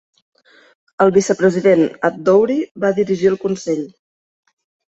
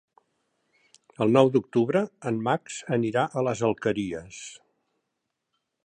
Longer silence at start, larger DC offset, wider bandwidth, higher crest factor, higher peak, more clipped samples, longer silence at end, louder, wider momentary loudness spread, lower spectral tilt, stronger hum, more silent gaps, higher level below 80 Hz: second, 1 s vs 1.2 s; neither; second, 8.2 kHz vs 9.8 kHz; second, 16 dB vs 22 dB; about the same, -2 dBFS vs -4 dBFS; neither; second, 1.1 s vs 1.3 s; first, -16 LUFS vs -25 LUFS; second, 8 LU vs 15 LU; about the same, -6 dB/octave vs -6 dB/octave; neither; first, 2.71-2.75 s vs none; about the same, -60 dBFS vs -64 dBFS